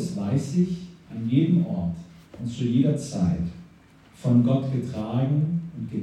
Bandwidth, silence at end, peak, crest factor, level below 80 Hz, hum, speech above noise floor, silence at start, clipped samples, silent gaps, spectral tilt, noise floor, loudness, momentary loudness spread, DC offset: 10.5 kHz; 0 s; -8 dBFS; 16 dB; -52 dBFS; none; 29 dB; 0 s; under 0.1%; none; -8 dB/octave; -52 dBFS; -25 LUFS; 13 LU; under 0.1%